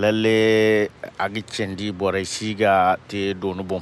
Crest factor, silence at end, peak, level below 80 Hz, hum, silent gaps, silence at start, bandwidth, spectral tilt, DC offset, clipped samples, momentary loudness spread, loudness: 14 dB; 0 s; -6 dBFS; -58 dBFS; none; none; 0 s; 12.5 kHz; -5 dB/octave; under 0.1%; under 0.1%; 10 LU; -21 LUFS